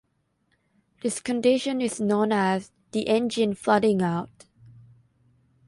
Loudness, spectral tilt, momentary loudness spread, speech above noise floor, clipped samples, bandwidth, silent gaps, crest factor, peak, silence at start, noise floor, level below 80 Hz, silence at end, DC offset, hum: -25 LUFS; -5 dB/octave; 9 LU; 48 dB; under 0.1%; 11.5 kHz; none; 20 dB; -6 dBFS; 1.05 s; -71 dBFS; -66 dBFS; 1.4 s; under 0.1%; none